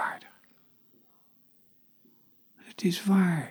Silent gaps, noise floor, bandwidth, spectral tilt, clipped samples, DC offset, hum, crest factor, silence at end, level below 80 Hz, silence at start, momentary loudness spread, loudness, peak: none; -62 dBFS; over 20 kHz; -6 dB/octave; under 0.1%; under 0.1%; none; 18 dB; 0 s; -80 dBFS; 0 s; 20 LU; -27 LUFS; -14 dBFS